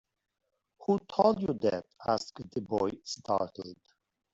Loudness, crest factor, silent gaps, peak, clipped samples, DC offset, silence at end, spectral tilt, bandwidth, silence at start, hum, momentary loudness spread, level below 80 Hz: -32 LUFS; 22 dB; none; -10 dBFS; under 0.1%; under 0.1%; 0.6 s; -6 dB/octave; 8 kHz; 0.8 s; none; 13 LU; -66 dBFS